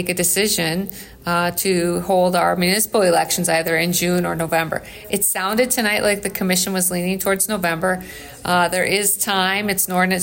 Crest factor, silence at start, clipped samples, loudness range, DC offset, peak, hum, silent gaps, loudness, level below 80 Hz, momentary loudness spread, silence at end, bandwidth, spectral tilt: 14 dB; 0 s; under 0.1%; 1 LU; under 0.1%; -6 dBFS; none; none; -18 LUFS; -50 dBFS; 6 LU; 0 s; 16.5 kHz; -3 dB/octave